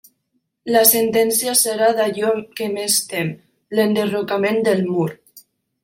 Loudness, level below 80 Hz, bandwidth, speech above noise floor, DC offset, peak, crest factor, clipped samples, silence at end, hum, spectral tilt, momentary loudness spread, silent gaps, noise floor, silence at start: -18 LUFS; -66 dBFS; 16.5 kHz; 53 dB; under 0.1%; 0 dBFS; 20 dB; under 0.1%; 0.45 s; none; -3 dB/octave; 11 LU; none; -70 dBFS; 0.65 s